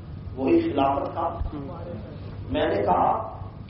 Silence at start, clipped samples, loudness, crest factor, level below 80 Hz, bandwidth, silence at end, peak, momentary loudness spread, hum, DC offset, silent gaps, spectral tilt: 0 s; under 0.1%; -25 LUFS; 18 dB; -42 dBFS; 5.6 kHz; 0 s; -8 dBFS; 15 LU; none; under 0.1%; none; -6 dB/octave